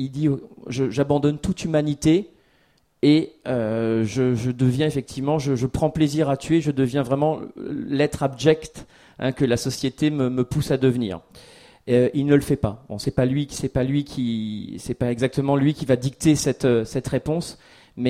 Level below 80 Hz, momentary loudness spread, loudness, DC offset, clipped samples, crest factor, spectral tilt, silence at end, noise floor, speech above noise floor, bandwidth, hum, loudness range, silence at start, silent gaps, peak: -46 dBFS; 8 LU; -22 LUFS; under 0.1%; under 0.1%; 18 dB; -6.5 dB/octave; 0 s; -62 dBFS; 41 dB; 15 kHz; none; 2 LU; 0 s; none; -4 dBFS